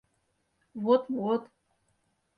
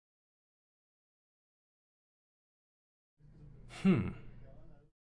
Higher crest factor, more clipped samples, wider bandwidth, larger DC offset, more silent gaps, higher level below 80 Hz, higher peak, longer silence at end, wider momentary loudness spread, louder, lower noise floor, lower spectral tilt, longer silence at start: about the same, 20 dB vs 24 dB; neither; second, 5 kHz vs 10.5 kHz; neither; neither; second, -76 dBFS vs -62 dBFS; first, -12 dBFS vs -18 dBFS; first, 0.95 s vs 0.5 s; second, 10 LU vs 26 LU; first, -29 LUFS vs -33 LUFS; first, -75 dBFS vs -55 dBFS; about the same, -8.5 dB/octave vs -8 dB/octave; second, 0.75 s vs 3.4 s